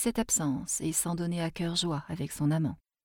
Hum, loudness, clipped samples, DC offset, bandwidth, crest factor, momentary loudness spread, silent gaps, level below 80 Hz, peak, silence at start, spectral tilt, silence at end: none; -30 LUFS; under 0.1%; under 0.1%; 19.5 kHz; 16 dB; 6 LU; none; -54 dBFS; -16 dBFS; 0 s; -4 dB/octave; 0.3 s